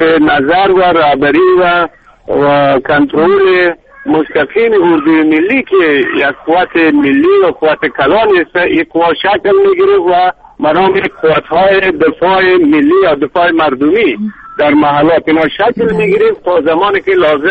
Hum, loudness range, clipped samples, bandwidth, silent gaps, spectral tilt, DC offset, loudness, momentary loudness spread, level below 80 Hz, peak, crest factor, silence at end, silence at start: none; 1 LU; under 0.1%; 4.8 kHz; none; -7.5 dB/octave; under 0.1%; -9 LUFS; 4 LU; -42 dBFS; 0 dBFS; 8 dB; 0 s; 0 s